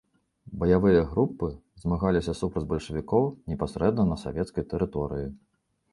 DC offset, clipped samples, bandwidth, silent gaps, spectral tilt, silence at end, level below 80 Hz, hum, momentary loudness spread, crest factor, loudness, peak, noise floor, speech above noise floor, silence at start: under 0.1%; under 0.1%; 11.5 kHz; none; -8 dB/octave; 0.55 s; -42 dBFS; none; 12 LU; 20 dB; -27 LUFS; -8 dBFS; -52 dBFS; 26 dB; 0.5 s